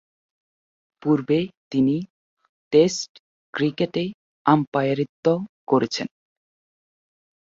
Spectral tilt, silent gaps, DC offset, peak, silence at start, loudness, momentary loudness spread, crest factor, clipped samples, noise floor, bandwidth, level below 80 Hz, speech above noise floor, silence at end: -6 dB/octave; 1.57-1.71 s, 2.10-2.37 s, 2.49-2.71 s, 3.09-3.53 s, 4.14-4.45 s, 4.67-4.72 s, 5.09-5.23 s, 5.49-5.67 s; under 0.1%; -4 dBFS; 1.05 s; -23 LUFS; 11 LU; 20 dB; under 0.1%; under -90 dBFS; 7.8 kHz; -64 dBFS; over 69 dB; 1.5 s